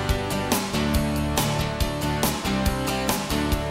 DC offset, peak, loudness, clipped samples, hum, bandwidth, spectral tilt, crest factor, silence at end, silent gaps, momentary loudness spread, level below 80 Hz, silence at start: under 0.1%; -6 dBFS; -24 LUFS; under 0.1%; none; 16.5 kHz; -4.5 dB/octave; 18 dB; 0 s; none; 2 LU; -32 dBFS; 0 s